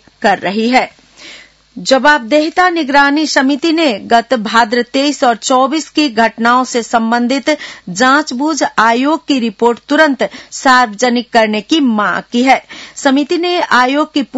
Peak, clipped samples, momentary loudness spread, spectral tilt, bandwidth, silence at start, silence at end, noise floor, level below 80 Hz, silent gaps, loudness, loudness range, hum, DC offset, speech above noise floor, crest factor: 0 dBFS; 0.3%; 5 LU; -3 dB/octave; 10.5 kHz; 0.2 s; 0 s; -37 dBFS; -52 dBFS; none; -12 LUFS; 1 LU; none; under 0.1%; 25 dB; 12 dB